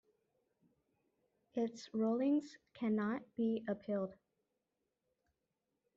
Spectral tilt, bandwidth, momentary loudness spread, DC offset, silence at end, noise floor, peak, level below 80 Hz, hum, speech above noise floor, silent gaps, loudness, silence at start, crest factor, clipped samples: -6.5 dB/octave; 7.4 kHz; 8 LU; under 0.1%; 1.8 s; -88 dBFS; -26 dBFS; -84 dBFS; none; 50 dB; none; -39 LUFS; 1.55 s; 14 dB; under 0.1%